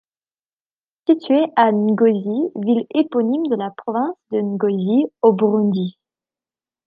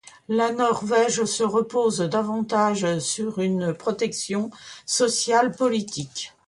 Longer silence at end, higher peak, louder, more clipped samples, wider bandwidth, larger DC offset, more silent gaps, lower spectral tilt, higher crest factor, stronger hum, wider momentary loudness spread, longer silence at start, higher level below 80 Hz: first, 0.95 s vs 0.2 s; first, -2 dBFS vs -6 dBFS; first, -18 LUFS vs -23 LUFS; neither; second, 5 kHz vs 11.5 kHz; neither; neither; first, -10.5 dB/octave vs -4 dB/octave; about the same, 16 dB vs 18 dB; neither; about the same, 8 LU vs 7 LU; first, 1.1 s vs 0.3 s; second, -72 dBFS vs -66 dBFS